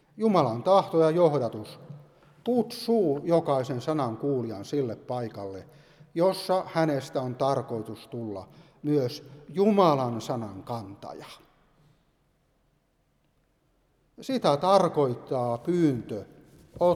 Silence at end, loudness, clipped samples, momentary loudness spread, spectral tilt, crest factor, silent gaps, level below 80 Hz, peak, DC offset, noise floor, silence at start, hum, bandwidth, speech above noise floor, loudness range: 0 s; -27 LUFS; under 0.1%; 18 LU; -7 dB/octave; 20 dB; none; -66 dBFS; -6 dBFS; under 0.1%; -70 dBFS; 0.15 s; none; 15.5 kHz; 43 dB; 5 LU